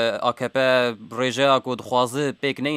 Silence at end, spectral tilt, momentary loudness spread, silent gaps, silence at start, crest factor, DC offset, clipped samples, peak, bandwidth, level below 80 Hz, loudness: 0 s; -4.5 dB/octave; 6 LU; none; 0 s; 18 dB; under 0.1%; under 0.1%; -4 dBFS; 15.5 kHz; -70 dBFS; -22 LUFS